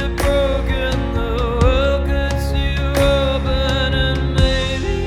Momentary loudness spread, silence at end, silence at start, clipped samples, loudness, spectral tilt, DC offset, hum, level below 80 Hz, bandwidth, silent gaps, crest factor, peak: 4 LU; 0 s; 0 s; under 0.1%; -18 LUFS; -6 dB/octave; under 0.1%; none; -20 dBFS; 15 kHz; none; 16 dB; -2 dBFS